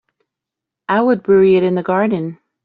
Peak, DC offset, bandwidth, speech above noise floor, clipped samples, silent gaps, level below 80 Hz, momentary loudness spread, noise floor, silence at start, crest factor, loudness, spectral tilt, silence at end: -2 dBFS; under 0.1%; 4.7 kHz; 70 dB; under 0.1%; none; -58 dBFS; 13 LU; -84 dBFS; 0.9 s; 14 dB; -15 LUFS; -6.5 dB/octave; 0.3 s